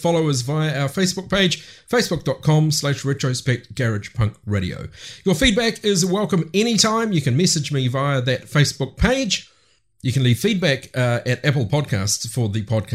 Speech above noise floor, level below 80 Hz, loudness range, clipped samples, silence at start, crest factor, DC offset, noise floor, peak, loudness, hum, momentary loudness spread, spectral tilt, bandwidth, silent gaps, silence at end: 40 dB; -40 dBFS; 3 LU; under 0.1%; 0 s; 20 dB; 0.1%; -60 dBFS; 0 dBFS; -20 LUFS; none; 7 LU; -4.5 dB/octave; 15.5 kHz; none; 0 s